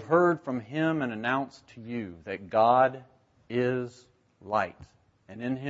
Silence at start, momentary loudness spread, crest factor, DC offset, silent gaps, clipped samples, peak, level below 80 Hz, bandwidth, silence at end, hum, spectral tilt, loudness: 0 s; 17 LU; 20 dB; under 0.1%; none; under 0.1%; -8 dBFS; -68 dBFS; 8 kHz; 0 s; none; -7.5 dB/octave; -28 LUFS